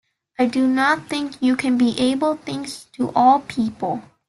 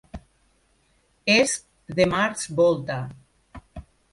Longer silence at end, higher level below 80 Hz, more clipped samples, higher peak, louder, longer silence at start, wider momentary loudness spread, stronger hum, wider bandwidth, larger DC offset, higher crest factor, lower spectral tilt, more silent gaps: about the same, 0.3 s vs 0.3 s; second, -58 dBFS vs -50 dBFS; neither; about the same, -4 dBFS vs -6 dBFS; about the same, -20 LUFS vs -22 LUFS; first, 0.4 s vs 0.15 s; second, 11 LU vs 24 LU; neither; about the same, 12 kHz vs 11.5 kHz; neither; about the same, 16 dB vs 20 dB; about the same, -4.5 dB/octave vs -4 dB/octave; neither